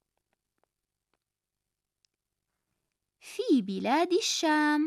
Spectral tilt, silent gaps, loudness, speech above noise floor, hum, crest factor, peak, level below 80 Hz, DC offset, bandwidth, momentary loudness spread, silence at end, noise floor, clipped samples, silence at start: -3 dB/octave; none; -27 LUFS; 62 dB; 50 Hz at -90 dBFS; 16 dB; -16 dBFS; -84 dBFS; under 0.1%; 13.5 kHz; 8 LU; 0 s; -88 dBFS; under 0.1%; 3.25 s